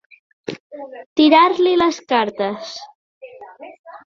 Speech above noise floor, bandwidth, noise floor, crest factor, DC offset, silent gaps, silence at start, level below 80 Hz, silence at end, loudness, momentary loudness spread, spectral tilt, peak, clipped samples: 23 dB; 7.4 kHz; -39 dBFS; 18 dB; under 0.1%; 0.60-0.70 s, 1.06-1.16 s, 2.95-3.21 s, 3.79-3.84 s; 0.5 s; -62 dBFS; 0.1 s; -16 LUFS; 24 LU; -4 dB/octave; 0 dBFS; under 0.1%